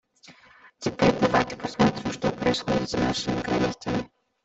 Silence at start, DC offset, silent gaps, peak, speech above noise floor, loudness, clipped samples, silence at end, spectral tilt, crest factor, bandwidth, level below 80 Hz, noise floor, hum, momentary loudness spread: 0.3 s; under 0.1%; none; -6 dBFS; 27 dB; -25 LUFS; under 0.1%; 0.4 s; -5.5 dB/octave; 20 dB; 8.2 kHz; -48 dBFS; -54 dBFS; none; 8 LU